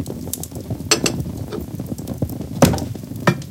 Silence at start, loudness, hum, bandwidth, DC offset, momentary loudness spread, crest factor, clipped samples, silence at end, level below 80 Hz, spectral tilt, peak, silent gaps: 0 s; -22 LUFS; none; 17 kHz; under 0.1%; 12 LU; 22 dB; under 0.1%; 0 s; -40 dBFS; -4.5 dB/octave; 0 dBFS; none